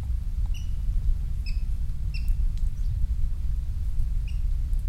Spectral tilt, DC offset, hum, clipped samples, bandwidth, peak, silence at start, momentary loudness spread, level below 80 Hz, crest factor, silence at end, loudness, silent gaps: -6.5 dB/octave; under 0.1%; none; under 0.1%; 6.2 kHz; -12 dBFS; 0 s; 2 LU; -26 dBFS; 12 dB; 0 s; -32 LUFS; none